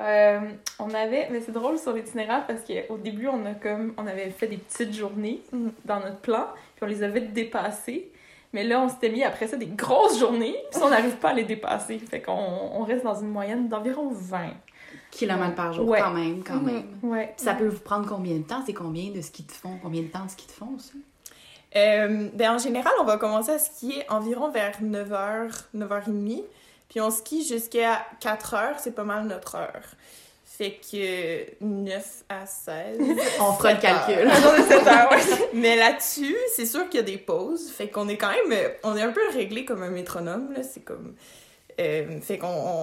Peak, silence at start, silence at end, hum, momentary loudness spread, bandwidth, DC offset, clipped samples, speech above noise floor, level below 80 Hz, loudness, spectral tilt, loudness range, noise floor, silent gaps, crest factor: -2 dBFS; 0 s; 0 s; none; 14 LU; 16 kHz; under 0.1%; under 0.1%; 25 dB; -64 dBFS; -25 LUFS; -3.5 dB/octave; 13 LU; -50 dBFS; none; 22 dB